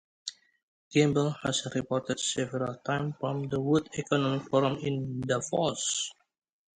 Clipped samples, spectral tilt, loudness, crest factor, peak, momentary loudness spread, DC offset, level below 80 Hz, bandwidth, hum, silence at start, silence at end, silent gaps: under 0.1%; -4.5 dB/octave; -30 LUFS; 20 dB; -10 dBFS; 7 LU; under 0.1%; -64 dBFS; 9.8 kHz; none; 0.25 s; 0.65 s; 0.63-0.91 s